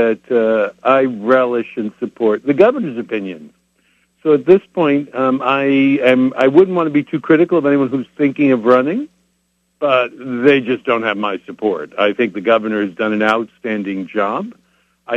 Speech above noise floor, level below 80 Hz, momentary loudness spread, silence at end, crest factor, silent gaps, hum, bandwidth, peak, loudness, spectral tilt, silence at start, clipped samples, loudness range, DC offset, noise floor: 50 dB; -62 dBFS; 10 LU; 0 s; 16 dB; none; none; 7.6 kHz; 0 dBFS; -15 LUFS; -7.5 dB/octave; 0 s; under 0.1%; 4 LU; under 0.1%; -64 dBFS